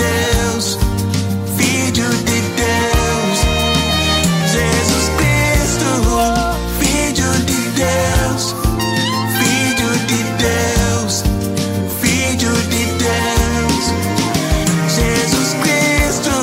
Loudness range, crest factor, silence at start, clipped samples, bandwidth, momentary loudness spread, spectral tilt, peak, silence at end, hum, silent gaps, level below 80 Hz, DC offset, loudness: 2 LU; 14 dB; 0 s; under 0.1%; 16.5 kHz; 3 LU; -4 dB/octave; 0 dBFS; 0 s; none; none; -24 dBFS; under 0.1%; -15 LUFS